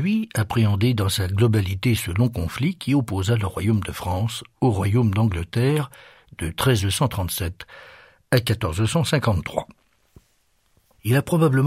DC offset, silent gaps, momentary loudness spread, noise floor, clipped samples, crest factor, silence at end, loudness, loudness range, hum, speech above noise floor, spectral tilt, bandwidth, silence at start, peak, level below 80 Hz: under 0.1%; none; 9 LU; -65 dBFS; under 0.1%; 18 dB; 0 s; -22 LUFS; 3 LU; none; 44 dB; -6 dB/octave; 16 kHz; 0 s; -4 dBFS; -44 dBFS